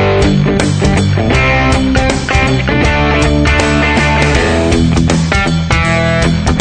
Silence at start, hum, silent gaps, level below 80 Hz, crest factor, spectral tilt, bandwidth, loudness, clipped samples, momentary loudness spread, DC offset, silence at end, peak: 0 s; none; none; -18 dBFS; 10 dB; -5.5 dB/octave; 9.4 kHz; -11 LUFS; under 0.1%; 2 LU; under 0.1%; 0 s; 0 dBFS